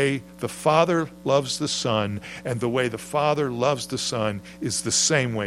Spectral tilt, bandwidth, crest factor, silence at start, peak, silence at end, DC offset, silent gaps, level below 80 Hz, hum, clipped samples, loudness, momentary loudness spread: -3.5 dB/octave; 16 kHz; 20 dB; 0 s; -4 dBFS; 0 s; under 0.1%; none; -58 dBFS; none; under 0.1%; -24 LUFS; 10 LU